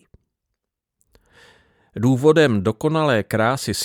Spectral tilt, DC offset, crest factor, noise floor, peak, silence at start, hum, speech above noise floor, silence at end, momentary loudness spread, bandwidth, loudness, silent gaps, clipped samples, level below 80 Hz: -5.5 dB/octave; under 0.1%; 18 dB; -80 dBFS; -4 dBFS; 1.95 s; none; 63 dB; 0 s; 6 LU; 17.5 kHz; -18 LUFS; none; under 0.1%; -56 dBFS